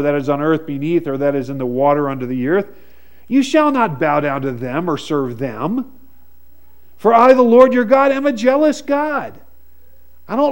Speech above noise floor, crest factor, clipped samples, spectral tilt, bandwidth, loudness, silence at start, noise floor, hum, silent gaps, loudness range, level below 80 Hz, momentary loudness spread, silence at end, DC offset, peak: 36 dB; 16 dB; under 0.1%; -6.5 dB/octave; 16.5 kHz; -16 LUFS; 0 s; -51 dBFS; none; none; 5 LU; -54 dBFS; 12 LU; 0 s; 1%; 0 dBFS